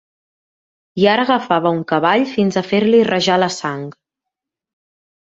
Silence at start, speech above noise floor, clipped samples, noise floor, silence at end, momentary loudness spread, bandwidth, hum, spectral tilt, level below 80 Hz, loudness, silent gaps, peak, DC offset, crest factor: 0.95 s; 68 dB; under 0.1%; -83 dBFS; 1.3 s; 11 LU; 8 kHz; none; -5 dB/octave; -60 dBFS; -16 LUFS; none; -2 dBFS; under 0.1%; 16 dB